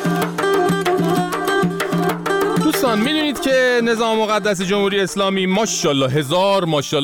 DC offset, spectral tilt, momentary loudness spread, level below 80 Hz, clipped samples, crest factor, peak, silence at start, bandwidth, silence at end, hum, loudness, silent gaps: 0.1%; -4.5 dB/octave; 3 LU; -52 dBFS; under 0.1%; 12 dB; -6 dBFS; 0 s; over 20 kHz; 0 s; none; -17 LUFS; none